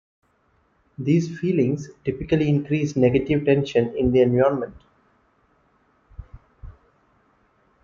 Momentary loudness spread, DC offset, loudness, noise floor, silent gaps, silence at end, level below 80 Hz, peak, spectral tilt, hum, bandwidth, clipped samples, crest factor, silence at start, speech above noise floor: 11 LU; under 0.1%; -21 LUFS; -64 dBFS; none; 1.15 s; -48 dBFS; -6 dBFS; -8 dB/octave; none; 7.4 kHz; under 0.1%; 18 dB; 1 s; 44 dB